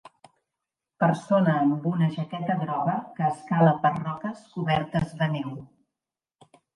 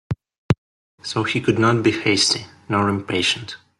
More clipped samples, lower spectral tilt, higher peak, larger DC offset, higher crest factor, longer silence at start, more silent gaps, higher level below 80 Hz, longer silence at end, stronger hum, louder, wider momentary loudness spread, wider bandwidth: neither; first, -8 dB/octave vs -4 dB/octave; second, -6 dBFS vs -2 dBFS; neither; about the same, 20 dB vs 20 dB; first, 1 s vs 0.1 s; second, none vs 0.38-0.49 s, 0.58-0.98 s; second, -60 dBFS vs -50 dBFS; first, 1.1 s vs 0.25 s; neither; second, -25 LUFS vs -20 LUFS; about the same, 11 LU vs 10 LU; second, 10.5 kHz vs 12 kHz